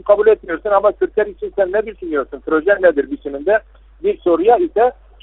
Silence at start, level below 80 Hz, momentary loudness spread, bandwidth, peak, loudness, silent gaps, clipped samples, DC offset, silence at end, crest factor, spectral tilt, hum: 0.05 s; -44 dBFS; 9 LU; 4 kHz; 0 dBFS; -16 LUFS; none; under 0.1%; under 0.1%; 0.3 s; 16 dB; -3.5 dB/octave; none